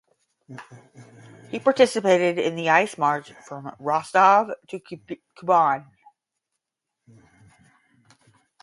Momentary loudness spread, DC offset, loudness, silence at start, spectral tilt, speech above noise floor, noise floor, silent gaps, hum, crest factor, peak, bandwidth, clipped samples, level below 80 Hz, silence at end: 22 LU; under 0.1%; -21 LUFS; 0.5 s; -4.5 dB/octave; 62 dB; -84 dBFS; none; none; 22 dB; -2 dBFS; 11.5 kHz; under 0.1%; -74 dBFS; 2.8 s